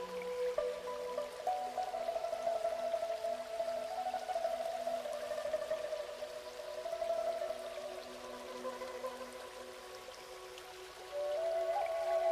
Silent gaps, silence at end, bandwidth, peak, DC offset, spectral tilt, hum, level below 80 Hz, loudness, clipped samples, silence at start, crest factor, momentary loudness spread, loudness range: none; 0 s; 15 kHz; -22 dBFS; under 0.1%; -2.5 dB/octave; none; -72 dBFS; -40 LUFS; under 0.1%; 0 s; 16 dB; 12 LU; 7 LU